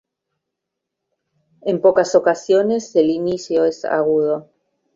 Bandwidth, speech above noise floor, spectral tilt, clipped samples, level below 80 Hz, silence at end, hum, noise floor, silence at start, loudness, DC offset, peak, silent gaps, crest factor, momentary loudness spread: 7.8 kHz; 64 dB; -5.5 dB/octave; under 0.1%; -62 dBFS; 0.55 s; none; -81 dBFS; 1.65 s; -18 LUFS; under 0.1%; -2 dBFS; none; 18 dB; 7 LU